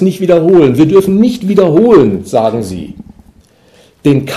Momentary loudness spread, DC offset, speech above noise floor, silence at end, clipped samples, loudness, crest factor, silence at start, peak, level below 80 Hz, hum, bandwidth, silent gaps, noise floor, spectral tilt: 12 LU; under 0.1%; 37 dB; 0 s; 2%; -9 LUFS; 10 dB; 0 s; 0 dBFS; -42 dBFS; none; 14 kHz; none; -45 dBFS; -7.5 dB/octave